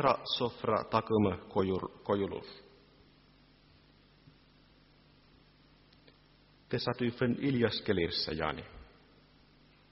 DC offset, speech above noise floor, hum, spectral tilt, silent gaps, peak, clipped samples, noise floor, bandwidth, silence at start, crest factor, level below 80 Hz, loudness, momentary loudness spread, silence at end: under 0.1%; 31 dB; none; -4.5 dB/octave; none; -12 dBFS; under 0.1%; -63 dBFS; 5.8 kHz; 0 s; 22 dB; -60 dBFS; -33 LUFS; 10 LU; 1.1 s